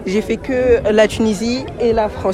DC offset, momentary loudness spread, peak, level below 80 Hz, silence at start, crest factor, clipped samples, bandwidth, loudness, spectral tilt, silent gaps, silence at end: under 0.1%; 6 LU; 0 dBFS; -34 dBFS; 0 s; 14 dB; under 0.1%; 14 kHz; -16 LUFS; -5.5 dB/octave; none; 0 s